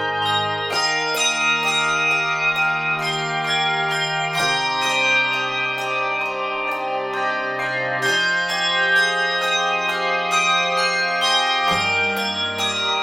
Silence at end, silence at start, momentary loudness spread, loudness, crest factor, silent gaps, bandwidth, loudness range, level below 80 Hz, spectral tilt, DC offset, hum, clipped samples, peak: 0 s; 0 s; 6 LU; -19 LUFS; 14 dB; none; 16.5 kHz; 3 LU; -58 dBFS; -1.5 dB/octave; under 0.1%; none; under 0.1%; -6 dBFS